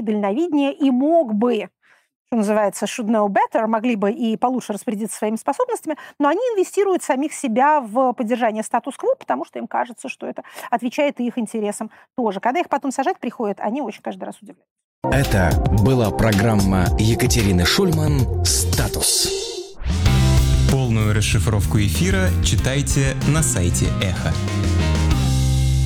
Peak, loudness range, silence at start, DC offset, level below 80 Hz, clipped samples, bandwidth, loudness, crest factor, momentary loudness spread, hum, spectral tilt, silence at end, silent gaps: -6 dBFS; 6 LU; 0 s; under 0.1%; -28 dBFS; under 0.1%; 19 kHz; -19 LUFS; 12 dB; 9 LU; none; -5 dB/octave; 0 s; 2.16-2.25 s, 14.70-14.76 s, 14.84-15.02 s